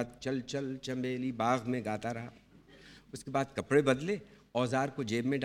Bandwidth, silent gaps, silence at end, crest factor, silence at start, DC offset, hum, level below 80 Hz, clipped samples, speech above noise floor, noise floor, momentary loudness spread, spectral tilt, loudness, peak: 13.5 kHz; none; 0 s; 20 dB; 0 s; under 0.1%; none; -66 dBFS; under 0.1%; 24 dB; -57 dBFS; 11 LU; -6 dB/octave; -34 LUFS; -14 dBFS